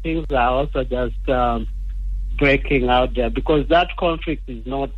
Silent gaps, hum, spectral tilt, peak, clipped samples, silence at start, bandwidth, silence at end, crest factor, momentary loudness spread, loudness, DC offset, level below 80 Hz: none; none; -8 dB/octave; -4 dBFS; under 0.1%; 0 s; 5.4 kHz; 0 s; 16 dB; 12 LU; -20 LUFS; under 0.1%; -26 dBFS